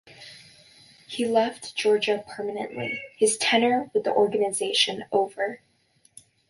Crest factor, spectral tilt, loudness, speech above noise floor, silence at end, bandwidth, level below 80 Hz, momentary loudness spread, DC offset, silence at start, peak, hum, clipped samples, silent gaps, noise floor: 18 dB; -2.5 dB/octave; -24 LUFS; 39 dB; 0.95 s; 11.5 kHz; -72 dBFS; 12 LU; under 0.1%; 0.1 s; -8 dBFS; none; under 0.1%; none; -64 dBFS